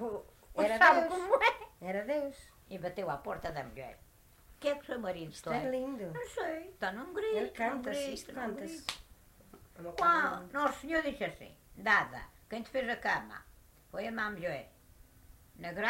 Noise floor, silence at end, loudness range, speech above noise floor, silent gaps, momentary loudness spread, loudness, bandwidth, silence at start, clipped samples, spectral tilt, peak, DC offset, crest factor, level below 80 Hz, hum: -60 dBFS; 0 s; 9 LU; 24 dB; none; 17 LU; -34 LUFS; 16 kHz; 0 s; under 0.1%; -4 dB/octave; -10 dBFS; under 0.1%; 24 dB; -62 dBFS; none